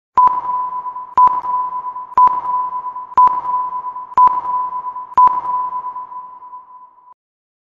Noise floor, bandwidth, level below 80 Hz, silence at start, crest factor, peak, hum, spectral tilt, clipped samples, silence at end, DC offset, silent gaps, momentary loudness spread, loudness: -42 dBFS; 4.2 kHz; -56 dBFS; 0.15 s; 14 dB; -2 dBFS; none; -5.5 dB/octave; under 0.1%; 0.85 s; under 0.1%; none; 16 LU; -16 LUFS